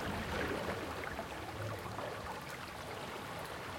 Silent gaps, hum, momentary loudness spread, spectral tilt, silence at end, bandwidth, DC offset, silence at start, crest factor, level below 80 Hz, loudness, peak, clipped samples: none; none; 6 LU; -4.5 dB/octave; 0 s; 16.5 kHz; under 0.1%; 0 s; 18 dB; -58 dBFS; -42 LUFS; -24 dBFS; under 0.1%